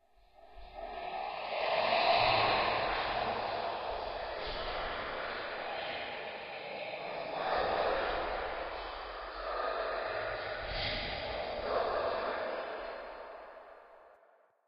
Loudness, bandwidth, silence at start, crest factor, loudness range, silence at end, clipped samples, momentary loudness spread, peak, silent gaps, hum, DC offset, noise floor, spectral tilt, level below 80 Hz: -35 LUFS; 6 kHz; 0.4 s; 22 dB; 7 LU; 0.55 s; under 0.1%; 13 LU; -14 dBFS; none; none; under 0.1%; -66 dBFS; -6 dB/octave; -54 dBFS